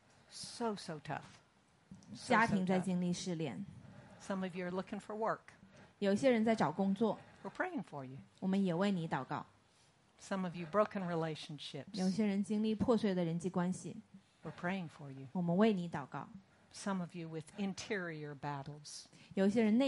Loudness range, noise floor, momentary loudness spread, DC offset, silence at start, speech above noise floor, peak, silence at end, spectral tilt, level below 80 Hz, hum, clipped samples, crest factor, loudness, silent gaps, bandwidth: 4 LU; -70 dBFS; 18 LU; under 0.1%; 0.3 s; 33 dB; -18 dBFS; 0 s; -6 dB/octave; -74 dBFS; none; under 0.1%; 18 dB; -37 LUFS; none; 11.5 kHz